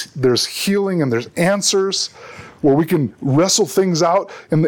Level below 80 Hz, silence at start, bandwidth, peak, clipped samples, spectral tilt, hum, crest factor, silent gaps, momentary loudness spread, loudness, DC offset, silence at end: -56 dBFS; 0 s; 19 kHz; -4 dBFS; under 0.1%; -4.5 dB/octave; none; 14 dB; none; 6 LU; -17 LUFS; under 0.1%; 0 s